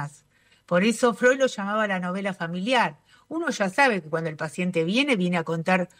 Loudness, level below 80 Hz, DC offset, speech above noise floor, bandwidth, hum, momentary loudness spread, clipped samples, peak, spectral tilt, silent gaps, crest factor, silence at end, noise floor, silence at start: -24 LUFS; -70 dBFS; under 0.1%; 37 dB; 15.5 kHz; none; 9 LU; under 0.1%; -8 dBFS; -5 dB/octave; none; 16 dB; 0.15 s; -61 dBFS; 0 s